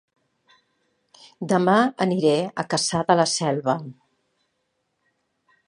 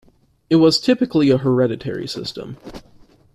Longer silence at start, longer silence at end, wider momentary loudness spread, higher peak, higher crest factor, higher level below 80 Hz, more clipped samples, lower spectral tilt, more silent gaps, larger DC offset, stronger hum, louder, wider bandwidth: first, 1.4 s vs 0.5 s; first, 1.75 s vs 0.55 s; second, 8 LU vs 20 LU; about the same, -2 dBFS vs -2 dBFS; first, 22 dB vs 16 dB; second, -66 dBFS vs -52 dBFS; neither; second, -4.5 dB/octave vs -6 dB/octave; neither; neither; neither; second, -21 LUFS vs -17 LUFS; second, 11.5 kHz vs 13 kHz